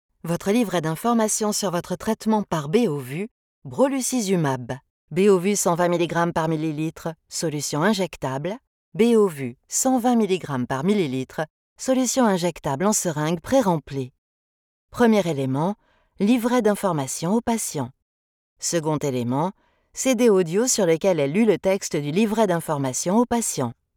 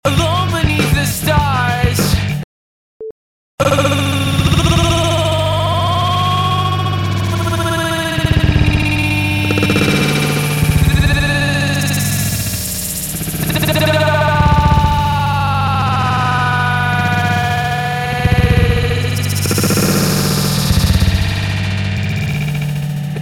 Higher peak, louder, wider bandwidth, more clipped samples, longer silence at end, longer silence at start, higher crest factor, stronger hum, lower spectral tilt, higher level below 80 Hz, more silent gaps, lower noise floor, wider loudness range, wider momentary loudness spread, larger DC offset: second, -6 dBFS vs -2 dBFS; second, -22 LUFS vs -14 LUFS; about the same, 19 kHz vs 17.5 kHz; neither; first, 0.25 s vs 0 s; first, 0.25 s vs 0.05 s; about the same, 16 dB vs 12 dB; neither; about the same, -5 dB/octave vs -5 dB/octave; second, -56 dBFS vs -24 dBFS; first, 3.31-3.62 s, 4.90-5.08 s, 8.67-8.92 s, 11.50-11.76 s, 14.18-14.88 s, 18.02-18.56 s vs 2.44-3.00 s, 3.11-3.58 s; about the same, under -90 dBFS vs under -90 dBFS; about the same, 3 LU vs 2 LU; first, 11 LU vs 6 LU; neither